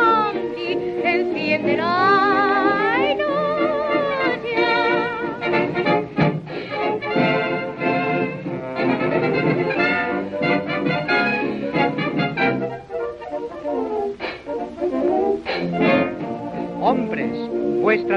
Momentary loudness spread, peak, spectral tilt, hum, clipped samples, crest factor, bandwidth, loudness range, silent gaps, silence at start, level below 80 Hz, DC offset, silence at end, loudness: 10 LU; -4 dBFS; -7.5 dB/octave; none; under 0.1%; 16 dB; 7.4 kHz; 5 LU; none; 0 s; -54 dBFS; under 0.1%; 0 s; -21 LUFS